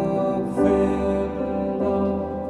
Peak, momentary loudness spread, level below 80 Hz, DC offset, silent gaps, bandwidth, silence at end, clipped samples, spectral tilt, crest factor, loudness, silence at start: -6 dBFS; 6 LU; -40 dBFS; under 0.1%; none; 11 kHz; 0 s; under 0.1%; -9 dB/octave; 16 dB; -23 LUFS; 0 s